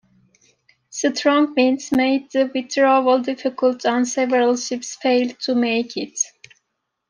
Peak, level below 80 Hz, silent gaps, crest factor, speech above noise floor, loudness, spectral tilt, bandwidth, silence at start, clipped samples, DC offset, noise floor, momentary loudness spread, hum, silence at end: -4 dBFS; -66 dBFS; none; 16 dB; 58 dB; -19 LUFS; -2.5 dB/octave; 10 kHz; 0.95 s; under 0.1%; under 0.1%; -76 dBFS; 8 LU; none; 0.8 s